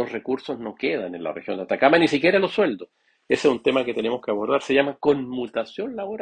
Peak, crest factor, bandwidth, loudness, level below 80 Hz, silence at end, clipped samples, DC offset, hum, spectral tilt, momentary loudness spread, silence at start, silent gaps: -2 dBFS; 20 dB; 9.6 kHz; -23 LUFS; -64 dBFS; 0 s; under 0.1%; under 0.1%; none; -5.5 dB/octave; 12 LU; 0 s; none